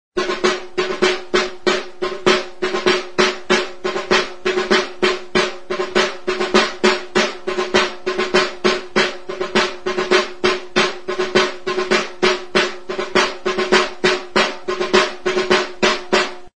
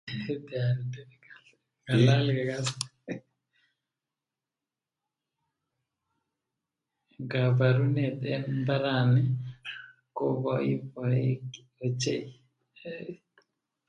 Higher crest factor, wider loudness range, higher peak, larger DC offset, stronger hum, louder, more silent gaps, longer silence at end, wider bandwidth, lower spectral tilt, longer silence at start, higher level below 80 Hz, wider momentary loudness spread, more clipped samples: about the same, 18 dB vs 22 dB; second, 1 LU vs 9 LU; first, 0 dBFS vs -8 dBFS; first, 2% vs under 0.1%; neither; first, -18 LUFS vs -28 LUFS; neither; second, 0 s vs 0.75 s; about the same, 10.5 kHz vs 11.5 kHz; second, -3 dB/octave vs -6.5 dB/octave; about the same, 0.1 s vs 0.05 s; first, -48 dBFS vs -68 dBFS; second, 6 LU vs 18 LU; neither